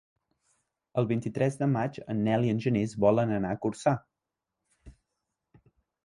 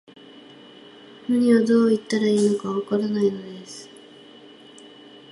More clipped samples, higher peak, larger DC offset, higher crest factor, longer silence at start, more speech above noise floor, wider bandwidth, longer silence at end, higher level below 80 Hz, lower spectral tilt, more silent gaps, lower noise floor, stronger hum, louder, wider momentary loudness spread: neither; second, -10 dBFS vs -6 dBFS; neither; about the same, 20 dB vs 16 dB; second, 0.95 s vs 1.3 s; first, 60 dB vs 26 dB; about the same, 11 kHz vs 11.5 kHz; second, 1.15 s vs 1.45 s; first, -60 dBFS vs -68 dBFS; first, -8 dB/octave vs -6 dB/octave; neither; first, -87 dBFS vs -46 dBFS; neither; second, -28 LUFS vs -21 LUFS; second, 7 LU vs 21 LU